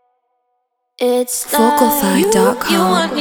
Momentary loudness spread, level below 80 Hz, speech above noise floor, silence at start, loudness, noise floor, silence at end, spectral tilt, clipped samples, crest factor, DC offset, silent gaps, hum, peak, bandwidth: 5 LU; -52 dBFS; 56 dB; 1 s; -14 LUFS; -69 dBFS; 0 s; -4 dB/octave; under 0.1%; 16 dB; under 0.1%; none; none; 0 dBFS; over 20 kHz